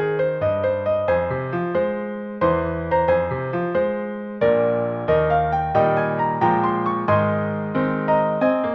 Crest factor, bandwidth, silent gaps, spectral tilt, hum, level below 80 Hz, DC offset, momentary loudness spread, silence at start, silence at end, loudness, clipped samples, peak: 16 dB; 5.8 kHz; none; -9.5 dB/octave; none; -44 dBFS; under 0.1%; 6 LU; 0 s; 0 s; -21 LUFS; under 0.1%; -4 dBFS